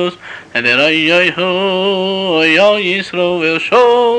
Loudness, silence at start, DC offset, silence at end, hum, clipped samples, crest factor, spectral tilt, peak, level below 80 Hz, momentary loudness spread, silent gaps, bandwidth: -12 LUFS; 0 s; under 0.1%; 0 s; none; under 0.1%; 12 dB; -4.5 dB/octave; -2 dBFS; -56 dBFS; 6 LU; none; 9.6 kHz